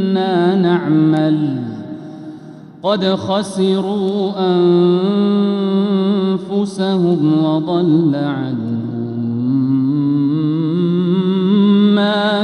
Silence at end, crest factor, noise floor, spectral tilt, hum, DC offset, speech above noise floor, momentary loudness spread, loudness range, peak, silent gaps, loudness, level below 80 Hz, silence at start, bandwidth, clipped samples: 0 s; 12 dB; -35 dBFS; -8 dB/octave; none; under 0.1%; 21 dB; 9 LU; 3 LU; -2 dBFS; none; -15 LUFS; -62 dBFS; 0 s; 11 kHz; under 0.1%